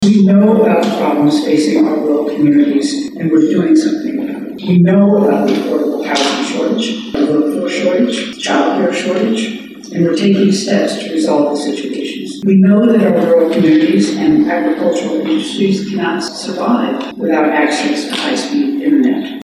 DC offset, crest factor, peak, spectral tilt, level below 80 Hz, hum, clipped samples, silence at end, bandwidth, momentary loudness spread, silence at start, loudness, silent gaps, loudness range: under 0.1%; 10 dB; -2 dBFS; -6 dB/octave; -54 dBFS; none; under 0.1%; 0 s; 13 kHz; 9 LU; 0 s; -13 LUFS; none; 4 LU